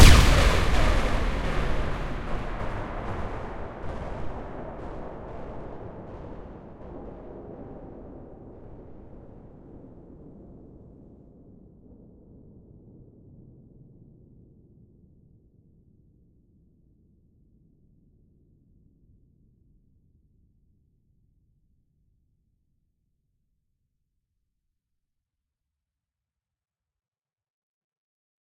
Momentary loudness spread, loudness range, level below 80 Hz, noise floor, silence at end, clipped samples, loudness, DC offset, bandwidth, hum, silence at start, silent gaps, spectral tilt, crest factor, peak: 27 LU; 24 LU; -32 dBFS; under -90 dBFS; 17.9 s; under 0.1%; -29 LUFS; under 0.1%; 16 kHz; none; 0 s; none; -4.5 dB/octave; 28 dB; 0 dBFS